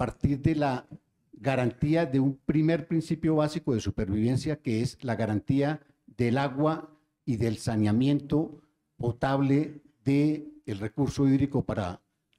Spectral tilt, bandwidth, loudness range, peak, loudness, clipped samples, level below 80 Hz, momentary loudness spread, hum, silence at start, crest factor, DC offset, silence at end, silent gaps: -7.5 dB/octave; 12 kHz; 2 LU; -12 dBFS; -28 LUFS; under 0.1%; -50 dBFS; 10 LU; none; 0 s; 16 dB; under 0.1%; 0.45 s; none